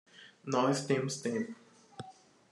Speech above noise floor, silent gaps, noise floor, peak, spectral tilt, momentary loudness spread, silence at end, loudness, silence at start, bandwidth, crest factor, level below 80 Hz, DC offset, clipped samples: 23 dB; none; -55 dBFS; -16 dBFS; -5 dB/octave; 22 LU; 0.4 s; -33 LUFS; 0.15 s; 12.5 kHz; 18 dB; -80 dBFS; under 0.1%; under 0.1%